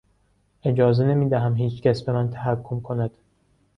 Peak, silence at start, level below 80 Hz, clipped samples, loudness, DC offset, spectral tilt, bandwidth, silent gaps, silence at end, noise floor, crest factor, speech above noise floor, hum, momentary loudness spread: -4 dBFS; 0.65 s; -54 dBFS; under 0.1%; -23 LUFS; under 0.1%; -9.5 dB/octave; 6 kHz; none; 0.7 s; -64 dBFS; 18 dB; 43 dB; none; 9 LU